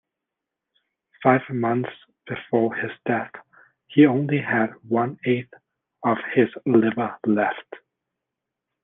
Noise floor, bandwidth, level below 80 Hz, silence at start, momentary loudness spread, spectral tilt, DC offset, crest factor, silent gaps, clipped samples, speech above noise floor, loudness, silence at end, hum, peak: -85 dBFS; 3.9 kHz; -70 dBFS; 1.2 s; 10 LU; -10.5 dB/octave; under 0.1%; 20 dB; none; under 0.1%; 63 dB; -22 LUFS; 1.05 s; none; -2 dBFS